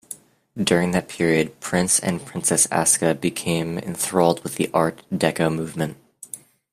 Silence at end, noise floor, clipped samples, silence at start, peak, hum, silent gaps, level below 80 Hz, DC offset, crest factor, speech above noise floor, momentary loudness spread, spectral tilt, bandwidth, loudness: 0.35 s; -42 dBFS; under 0.1%; 0.1 s; -2 dBFS; none; none; -56 dBFS; under 0.1%; 20 dB; 21 dB; 19 LU; -4 dB/octave; 16 kHz; -21 LUFS